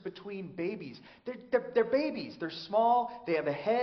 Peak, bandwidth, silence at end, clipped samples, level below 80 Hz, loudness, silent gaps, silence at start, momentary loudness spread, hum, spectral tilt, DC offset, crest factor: -16 dBFS; 6.2 kHz; 0 s; under 0.1%; -74 dBFS; -31 LUFS; none; 0.05 s; 16 LU; none; -3.5 dB/octave; under 0.1%; 16 dB